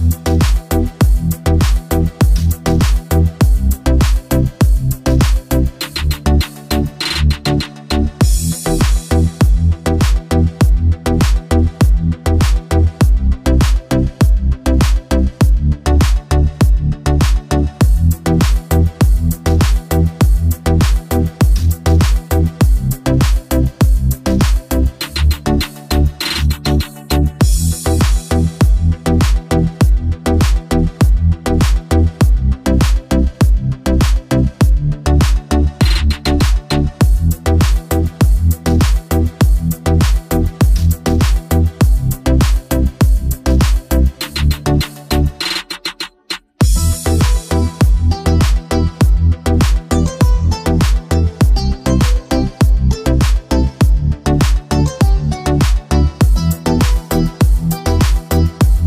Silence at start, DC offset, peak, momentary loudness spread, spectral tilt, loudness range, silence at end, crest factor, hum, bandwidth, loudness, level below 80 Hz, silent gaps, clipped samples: 0 s; under 0.1%; -2 dBFS; 3 LU; -6 dB/octave; 2 LU; 0 s; 10 dB; none; 16 kHz; -15 LUFS; -14 dBFS; none; under 0.1%